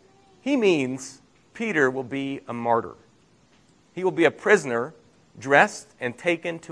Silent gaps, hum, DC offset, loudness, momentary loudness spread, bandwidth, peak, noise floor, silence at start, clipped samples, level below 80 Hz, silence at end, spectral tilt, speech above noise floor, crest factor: none; none; under 0.1%; -23 LUFS; 17 LU; 11 kHz; -2 dBFS; -59 dBFS; 0.45 s; under 0.1%; -70 dBFS; 0 s; -5 dB/octave; 36 dB; 24 dB